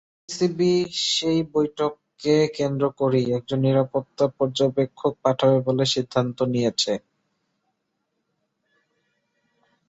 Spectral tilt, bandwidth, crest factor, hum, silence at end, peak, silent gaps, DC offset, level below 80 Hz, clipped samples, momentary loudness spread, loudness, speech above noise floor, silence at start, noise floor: -5.5 dB/octave; 8.2 kHz; 18 dB; none; 2.9 s; -6 dBFS; none; under 0.1%; -62 dBFS; under 0.1%; 5 LU; -23 LUFS; 54 dB; 0.3 s; -76 dBFS